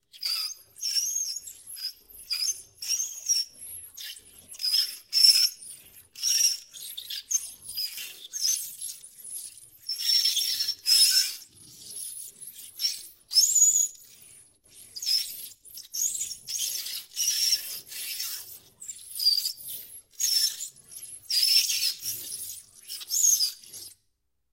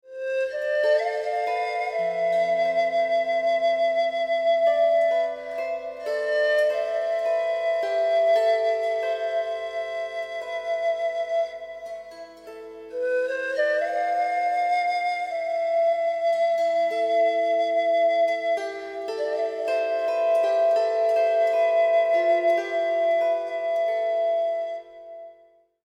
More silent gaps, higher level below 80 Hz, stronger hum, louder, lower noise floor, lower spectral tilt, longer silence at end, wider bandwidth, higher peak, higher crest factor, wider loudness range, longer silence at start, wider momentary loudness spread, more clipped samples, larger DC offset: neither; about the same, -74 dBFS vs -70 dBFS; second, none vs 50 Hz at -75 dBFS; about the same, -24 LUFS vs -24 LUFS; first, -77 dBFS vs -57 dBFS; second, 4.5 dB/octave vs -3 dB/octave; about the same, 0.6 s vs 0.55 s; first, 16 kHz vs 9.2 kHz; first, -6 dBFS vs -12 dBFS; first, 24 dB vs 12 dB; about the same, 6 LU vs 6 LU; about the same, 0.15 s vs 0.05 s; first, 21 LU vs 10 LU; neither; neither